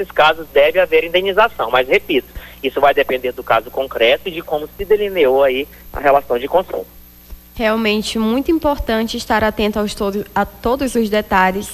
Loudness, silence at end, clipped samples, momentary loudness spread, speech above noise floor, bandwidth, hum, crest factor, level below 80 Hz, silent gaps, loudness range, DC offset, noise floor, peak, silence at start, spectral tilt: -16 LUFS; 0 s; under 0.1%; 9 LU; 22 dB; 16 kHz; 60 Hz at -45 dBFS; 16 dB; -38 dBFS; none; 3 LU; under 0.1%; -38 dBFS; 0 dBFS; 0 s; -4.5 dB/octave